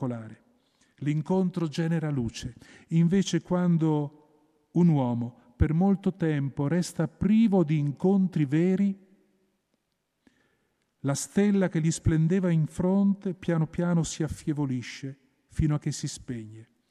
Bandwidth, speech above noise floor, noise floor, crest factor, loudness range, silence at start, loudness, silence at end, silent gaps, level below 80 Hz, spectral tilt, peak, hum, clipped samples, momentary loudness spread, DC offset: 12 kHz; 52 dB; -78 dBFS; 16 dB; 5 LU; 0 s; -27 LUFS; 0.25 s; none; -46 dBFS; -7 dB/octave; -10 dBFS; none; under 0.1%; 14 LU; under 0.1%